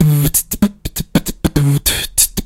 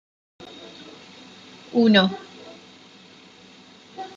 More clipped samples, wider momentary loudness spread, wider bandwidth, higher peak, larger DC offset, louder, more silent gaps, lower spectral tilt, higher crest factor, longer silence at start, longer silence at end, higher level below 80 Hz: neither; second, 6 LU vs 27 LU; first, 17 kHz vs 7.6 kHz; first, 0 dBFS vs -4 dBFS; neither; first, -15 LUFS vs -19 LUFS; neither; second, -4 dB/octave vs -6 dB/octave; second, 14 dB vs 24 dB; second, 0 s vs 0.4 s; about the same, 0 s vs 0.1 s; first, -28 dBFS vs -72 dBFS